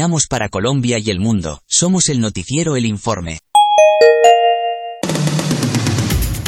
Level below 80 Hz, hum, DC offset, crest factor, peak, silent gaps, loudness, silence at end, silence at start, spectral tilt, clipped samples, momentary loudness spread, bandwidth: -32 dBFS; none; under 0.1%; 14 dB; 0 dBFS; none; -14 LUFS; 0 s; 0 s; -4.5 dB/octave; under 0.1%; 12 LU; 17 kHz